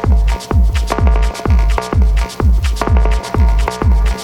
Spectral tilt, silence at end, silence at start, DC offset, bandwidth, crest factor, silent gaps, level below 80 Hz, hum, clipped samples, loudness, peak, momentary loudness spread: -6.5 dB/octave; 0 s; 0 s; under 0.1%; 12 kHz; 10 dB; none; -12 dBFS; none; under 0.1%; -15 LUFS; 0 dBFS; 2 LU